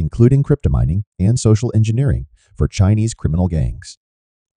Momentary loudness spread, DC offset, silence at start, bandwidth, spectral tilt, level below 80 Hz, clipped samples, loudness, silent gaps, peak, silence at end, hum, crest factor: 8 LU; under 0.1%; 0 s; 10 kHz; -7.5 dB/octave; -28 dBFS; under 0.1%; -17 LUFS; 1.07-1.12 s; 0 dBFS; 0.65 s; none; 16 dB